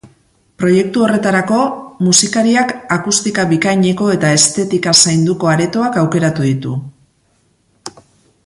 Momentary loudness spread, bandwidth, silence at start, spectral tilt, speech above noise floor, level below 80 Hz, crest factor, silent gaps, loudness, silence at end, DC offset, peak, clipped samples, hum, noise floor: 9 LU; 12 kHz; 0.05 s; -4 dB/octave; 45 dB; -52 dBFS; 14 dB; none; -13 LUFS; 0.55 s; under 0.1%; 0 dBFS; under 0.1%; none; -57 dBFS